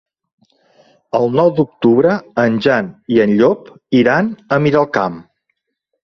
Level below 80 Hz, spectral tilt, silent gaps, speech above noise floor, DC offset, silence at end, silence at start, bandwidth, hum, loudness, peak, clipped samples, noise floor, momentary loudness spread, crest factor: -54 dBFS; -8 dB/octave; none; 59 dB; under 0.1%; 0.8 s; 1.15 s; 6.4 kHz; none; -15 LUFS; 0 dBFS; under 0.1%; -73 dBFS; 7 LU; 14 dB